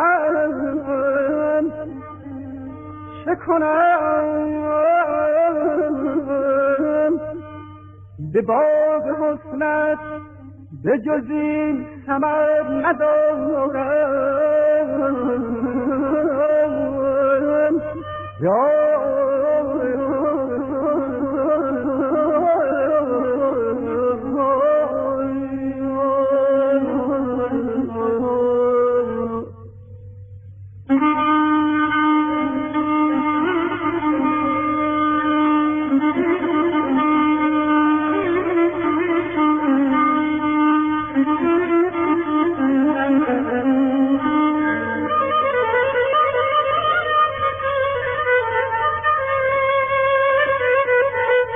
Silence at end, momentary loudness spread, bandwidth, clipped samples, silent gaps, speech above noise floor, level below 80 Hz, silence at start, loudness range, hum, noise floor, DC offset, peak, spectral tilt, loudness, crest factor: 0 s; 6 LU; 3.7 kHz; under 0.1%; none; 21 dB; -50 dBFS; 0 s; 3 LU; none; -40 dBFS; under 0.1%; -6 dBFS; -8.5 dB/octave; -19 LUFS; 14 dB